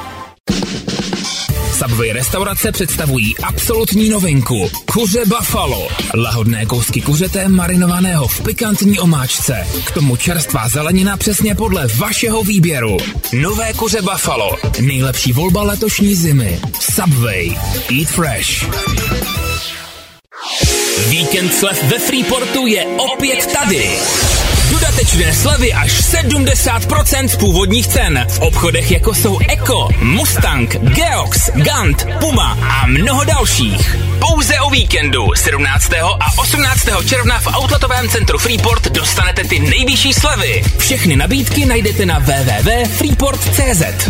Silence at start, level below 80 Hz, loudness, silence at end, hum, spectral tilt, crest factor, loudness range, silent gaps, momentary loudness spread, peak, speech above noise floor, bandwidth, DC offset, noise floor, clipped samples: 0 s; -20 dBFS; -13 LUFS; 0 s; none; -4 dB/octave; 12 dB; 3 LU; 0.40-0.44 s; 5 LU; 0 dBFS; 23 dB; 16.5 kHz; under 0.1%; -35 dBFS; under 0.1%